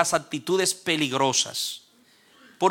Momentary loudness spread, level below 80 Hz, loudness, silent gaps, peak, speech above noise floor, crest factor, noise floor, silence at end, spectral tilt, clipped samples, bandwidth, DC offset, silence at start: 8 LU; -68 dBFS; -24 LUFS; none; -4 dBFS; 34 dB; 20 dB; -58 dBFS; 0 s; -2.5 dB/octave; under 0.1%; 17.5 kHz; under 0.1%; 0 s